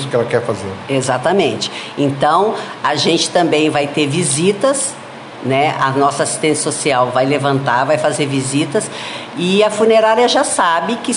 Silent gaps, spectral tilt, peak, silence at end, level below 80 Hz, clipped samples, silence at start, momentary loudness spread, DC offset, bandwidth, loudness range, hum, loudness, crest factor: none; -4 dB/octave; 0 dBFS; 0 s; -56 dBFS; under 0.1%; 0 s; 8 LU; under 0.1%; 11.5 kHz; 1 LU; none; -15 LUFS; 14 dB